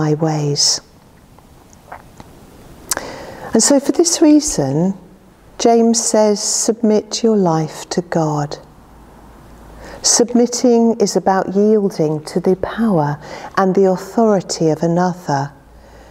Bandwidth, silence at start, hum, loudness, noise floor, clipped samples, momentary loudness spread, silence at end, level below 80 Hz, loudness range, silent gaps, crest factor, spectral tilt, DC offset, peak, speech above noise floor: 16 kHz; 0 s; none; -15 LUFS; -44 dBFS; under 0.1%; 10 LU; 0.6 s; -48 dBFS; 5 LU; none; 16 dB; -4.5 dB/octave; under 0.1%; 0 dBFS; 30 dB